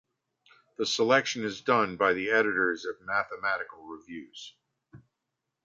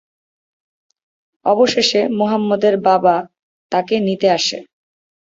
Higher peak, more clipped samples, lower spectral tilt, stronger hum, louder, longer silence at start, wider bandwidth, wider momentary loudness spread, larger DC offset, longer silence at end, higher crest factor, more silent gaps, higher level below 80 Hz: second, -8 dBFS vs -2 dBFS; neither; about the same, -3.5 dB/octave vs -4.5 dB/octave; neither; second, -27 LUFS vs -16 LUFS; second, 0.8 s vs 1.45 s; about the same, 7.8 kHz vs 8 kHz; first, 20 LU vs 8 LU; neither; about the same, 0.7 s vs 0.7 s; first, 22 dB vs 16 dB; second, none vs 3.39-3.70 s; second, -70 dBFS vs -62 dBFS